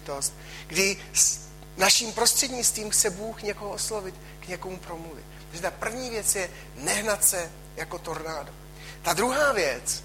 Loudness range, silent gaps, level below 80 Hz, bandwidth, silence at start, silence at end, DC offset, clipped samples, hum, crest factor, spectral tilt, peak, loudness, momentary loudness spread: 8 LU; none; -48 dBFS; 16.5 kHz; 0 s; 0 s; under 0.1%; under 0.1%; none; 22 dB; -1 dB/octave; -6 dBFS; -25 LUFS; 19 LU